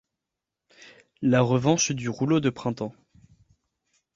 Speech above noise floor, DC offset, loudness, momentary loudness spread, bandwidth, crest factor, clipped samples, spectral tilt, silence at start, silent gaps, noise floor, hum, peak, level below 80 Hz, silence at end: 63 dB; under 0.1%; -24 LUFS; 10 LU; 7.8 kHz; 20 dB; under 0.1%; -5 dB/octave; 1.2 s; none; -86 dBFS; none; -8 dBFS; -60 dBFS; 1.25 s